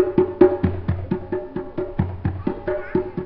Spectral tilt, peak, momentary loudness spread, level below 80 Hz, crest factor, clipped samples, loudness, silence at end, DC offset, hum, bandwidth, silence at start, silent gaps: -9 dB/octave; 0 dBFS; 11 LU; -42 dBFS; 22 dB; under 0.1%; -23 LUFS; 0 s; 0.1%; none; 4.8 kHz; 0 s; none